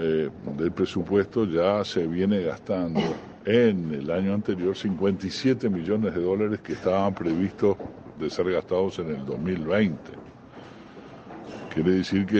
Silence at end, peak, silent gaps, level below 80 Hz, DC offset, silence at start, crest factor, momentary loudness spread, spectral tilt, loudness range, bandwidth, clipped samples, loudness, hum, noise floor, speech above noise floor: 0 s; -8 dBFS; none; -56 dBFS; under 0.1%; 0 s; 18 dB; 17 LU; -7 dB/octave; 4 LU; 8.4 kHz; under 0.1%; -26 LUFS; none; -45 dBFS; 20 dB